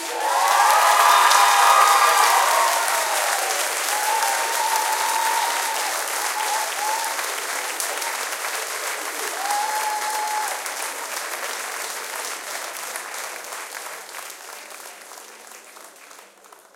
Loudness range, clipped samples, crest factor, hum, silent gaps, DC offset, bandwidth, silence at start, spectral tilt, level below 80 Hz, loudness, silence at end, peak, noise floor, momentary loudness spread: 16 LU; under 0.1%; 20 dB; none; none; under 0.1%; 17 kHz; 0 s; 3 dB/octave; -82 dBFS; -20 LUFS; 0.5 s; -2 dBFS; -49 dBFS; 20 LU